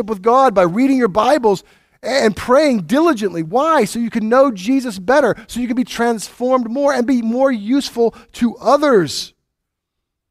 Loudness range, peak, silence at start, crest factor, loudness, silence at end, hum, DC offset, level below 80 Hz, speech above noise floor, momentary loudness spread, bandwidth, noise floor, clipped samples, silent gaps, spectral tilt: 2 LU; 0 dBFS; 0 s; 14 dB; -15 LUFS; 1 s; none; under 0.1%; -50 dBFS; 62 dB; 8 LU; 15.5 kHz; -77 dBFS; under 0.1%; none; -5 dB/octave